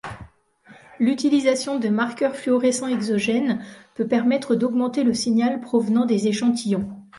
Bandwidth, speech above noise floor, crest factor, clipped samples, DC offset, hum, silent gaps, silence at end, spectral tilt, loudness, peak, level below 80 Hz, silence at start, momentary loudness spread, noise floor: 11.5 kHz; 31 dB; 16 dB; under 0.1%; under 0.1%; none; none; 0 s; -5 dB/octave; -21 LUFS; -6 dBFS; -58 dBFS; 0.05 s; 6 LU; -52 dBFS